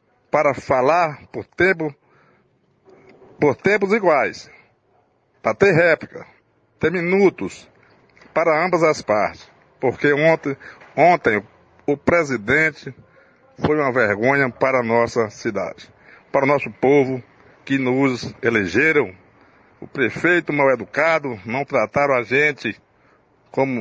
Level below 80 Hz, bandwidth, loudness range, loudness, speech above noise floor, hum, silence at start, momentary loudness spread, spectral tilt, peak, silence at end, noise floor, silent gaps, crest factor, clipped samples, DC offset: -56 dBFS; 9.2 kHz; 2 LU; -19 LUFS; 43 dB; none; 0.35 s; 12 LU; -6 dB/octave; -2 dBFS; 0 s; -61 dBFS; none; 18 dB; under 0.1%; under 0.1%